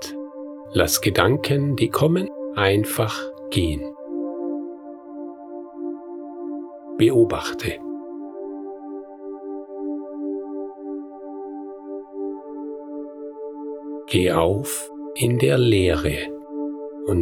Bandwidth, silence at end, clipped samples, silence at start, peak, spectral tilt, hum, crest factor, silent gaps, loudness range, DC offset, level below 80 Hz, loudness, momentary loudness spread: 18.5 kHz; 0 s; under 0.1%; 0 s; 0 dBFS; -5.5 dB/octave; none; 24 dB; none; 12 LU; under 0.1%; -44 dBFS; -23 LUFS; 17 LU